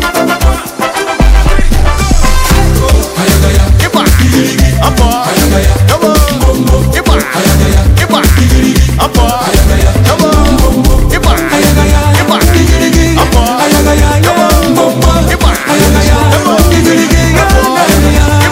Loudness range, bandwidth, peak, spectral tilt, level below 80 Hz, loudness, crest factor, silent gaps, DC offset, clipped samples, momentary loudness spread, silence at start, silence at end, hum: 1 LU; 16.5 kHz; 0 dBFS; -5 dB/octave; -10 dBFS; -8 LUFS; 6 dB; none; under 0.1%; 6%; 3 LU; 0 s; 0 s; none